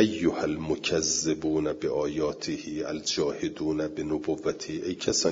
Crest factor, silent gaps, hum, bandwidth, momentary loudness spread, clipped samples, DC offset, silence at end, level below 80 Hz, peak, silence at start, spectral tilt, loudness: 20 dB; none; none; 7.8 kHz; 8 LU; under 0.1%; under 0.1%; 0 s; -56 dBFS; -8 dBFS; 0 s; -3.5 dB/octave; -29 LUFS